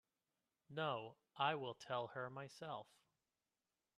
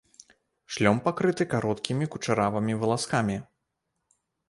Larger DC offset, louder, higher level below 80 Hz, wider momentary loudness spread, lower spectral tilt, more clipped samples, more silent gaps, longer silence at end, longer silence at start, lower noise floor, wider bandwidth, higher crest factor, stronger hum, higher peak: neither; second, -46 LUFS vs -27 LUFS; second, -90 dBFS vs -60 dBFS; first, 12 LU vs 6 LU; about the same, -5 dB/octave vs -5.5 dB/octave; neither; neither; about the same, 1.15 s vs 1.05 s; about the same, 0.7 s vs 0.7 s; first, under -90 dBFS vs -80 dBFS; first, 13 kHz vs 11.5 kHz; about the same, 24 dB vs 20 dB; neither; second, -26 dBFS vs -8 dBFS